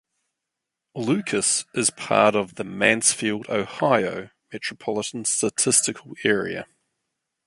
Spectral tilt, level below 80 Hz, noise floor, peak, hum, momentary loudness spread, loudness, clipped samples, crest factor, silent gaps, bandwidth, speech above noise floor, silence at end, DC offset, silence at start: -2.5 dB/octave; -64 dBFS; -84 dBFS; -2 dBFS; none; 13 LU; -22 LUFS; under 0.1%; 22 dB; none; 12 kHz; 61 dB; 0.85 s; under 0.1%; 0.95 s